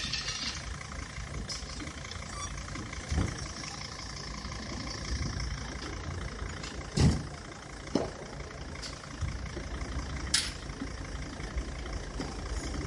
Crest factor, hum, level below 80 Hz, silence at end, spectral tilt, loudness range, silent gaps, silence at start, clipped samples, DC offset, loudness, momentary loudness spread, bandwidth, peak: 24 dB; none; -42 dBFS; 0 s; -4 dB/octave; 3 LU; none; 0 s; under 0.1%; under 0.1%; -36 LUFS; 11 LU; 11.5 kHz; -12 dBFS